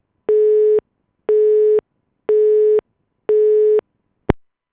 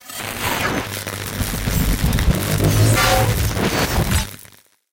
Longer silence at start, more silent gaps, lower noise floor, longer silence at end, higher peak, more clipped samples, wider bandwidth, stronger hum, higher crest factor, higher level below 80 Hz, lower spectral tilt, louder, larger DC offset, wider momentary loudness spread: first, 0.3 s vs 0.05 s; neither; first, -53 dBFS vs -48 dBFS; second, 0.35 s vs 0.55 s; first, 0 dBFS vs -4 dBFS; neither; second, 3.6 kHz vs 17.5 kHz; neither; about the same, 16 dB vs 16 dB; second, -44 dBFS vs -26 dBFS; first, -11.5 dB/octave vs -4.5 dB/octave; first, -16 LUFS vs -19 LUFS; neither; about the same, 11 LU vs 11 LU